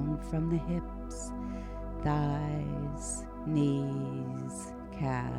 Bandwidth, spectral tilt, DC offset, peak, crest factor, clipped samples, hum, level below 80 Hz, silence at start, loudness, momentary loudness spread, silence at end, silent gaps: 12 kHz; -7 dB/octave; under 0.1%; -18 dBFS; 16 dB; under 0.1%; none; -44 dBFS; 0 s; -34 LUFS; 10 LU; 0 s; none